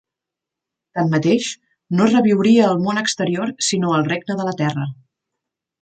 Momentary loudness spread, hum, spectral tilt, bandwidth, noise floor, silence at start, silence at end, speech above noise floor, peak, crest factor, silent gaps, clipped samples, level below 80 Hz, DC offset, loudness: 12 LU; none; -5 dB/octave; 9.2 kHz; -85 dBFS; 0.95 s; 0.9 s; 68 dB; -4 dBFS; 16 dB; none; under 0.1%; -62 dBFS; under 0.1%; -18 LUFS